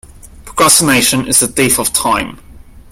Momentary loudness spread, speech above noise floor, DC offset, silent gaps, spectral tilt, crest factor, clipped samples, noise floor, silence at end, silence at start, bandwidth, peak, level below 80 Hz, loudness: 10 LU; 23 dB; under 0.1%; none; -2 dB/octave; 14 dB; 0.1%; -34 dBFS; 0.1 s; 0.15 s; over 20 kHz; 0 dBFS; -38 dBFS; -10 LUFS